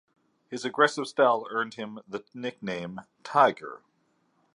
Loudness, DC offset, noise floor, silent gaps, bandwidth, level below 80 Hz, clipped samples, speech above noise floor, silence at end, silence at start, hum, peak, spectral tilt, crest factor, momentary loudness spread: -27 LUFS; under 0.1%; -70 dBFS; none; 11 kHz; -76 dBFS; under 0.1%; 43 dB; 0.8 s; 0.5 s; none; -6 dBFS; -4.5 dB/octave; 22 dB; 18 LU